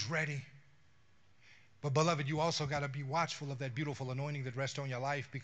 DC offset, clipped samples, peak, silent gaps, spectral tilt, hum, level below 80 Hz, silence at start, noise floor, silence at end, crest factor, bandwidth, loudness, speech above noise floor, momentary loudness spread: under 0.1%; under 0.1%; -16 dBFS; none; -5 dB/octave; none; -72 dBFS; 0 s; -70 dBFS; 0 s; 22 dB; 8.6 kHz; -37 LUFS; 34 dB; 8 LU